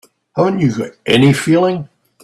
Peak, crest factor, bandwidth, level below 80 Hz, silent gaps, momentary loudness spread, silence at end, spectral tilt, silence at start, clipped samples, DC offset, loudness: 0 dBFS; 14 dB; 13 kHz; -52 dBFS; none; 12 LU; 0.4 s; -6 dB/octave; 0.35 s; under 0.1%; under 0.1%; -14 LUFS